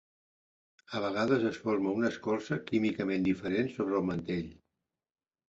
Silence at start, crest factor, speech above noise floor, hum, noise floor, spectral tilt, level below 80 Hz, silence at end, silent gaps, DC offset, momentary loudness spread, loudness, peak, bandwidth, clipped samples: 0.9 s; 18 dB; 55 dB; none; -86 dBFS; -7 dB/octave; -64 dBFS; 0.95 s; none; under 0.1%; 7 LU; -32 LUFS; -16 dBFS; 7.8 kHz; under 0.1%